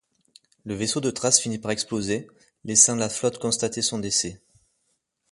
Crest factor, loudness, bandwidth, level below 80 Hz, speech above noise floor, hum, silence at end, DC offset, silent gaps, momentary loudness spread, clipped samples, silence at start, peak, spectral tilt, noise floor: 24 dB; -22 LUFS; 11.5 kHz; -58 dBFS; 49 dB; none; 0.95 s; under 0.1%; none; 14 LU; under 0.1%; 0.65 s; -2 dBFS; -2.5 dB/octave; -74 dBFS